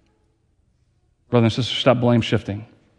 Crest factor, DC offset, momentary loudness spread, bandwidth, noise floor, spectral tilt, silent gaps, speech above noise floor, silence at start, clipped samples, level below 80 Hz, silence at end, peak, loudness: 22 dB; under 0.1%; 11 LU; 9.6 kHz; -64 dBFS; -6.5 dB/octave; none; 45 dB; 1.3 s; under 0.1%; -54 dBFS; 0.35 s; 0 dBFS; -19 LUFS